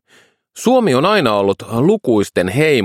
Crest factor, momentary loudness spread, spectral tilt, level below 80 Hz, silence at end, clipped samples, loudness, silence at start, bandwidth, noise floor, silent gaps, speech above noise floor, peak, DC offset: 14 dB; 4 LU; -5.5 dB/octave; -54 dBFS; 0 s; under 0.1%; -15 LUFS; 0.55 s; 16 kHz; -52 dBFS; none; 39 dB; 0 dBFS; under 0.1%